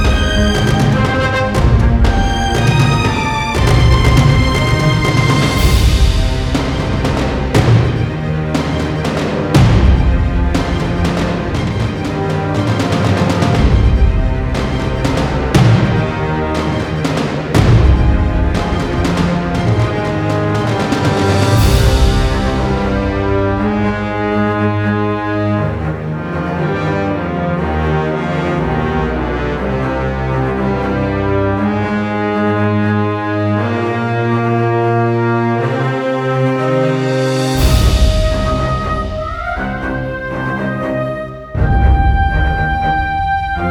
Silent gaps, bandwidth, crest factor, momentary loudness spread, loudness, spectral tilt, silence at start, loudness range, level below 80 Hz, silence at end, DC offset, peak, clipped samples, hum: none; 17.5 kHz; 14 dB; 6 LU; -15 LUFS; -6.5 dB/octave; 0 s; 4 LU; -20 dBFS; 0 s; under 0.1%; 0 dBFS; under 0.1%; none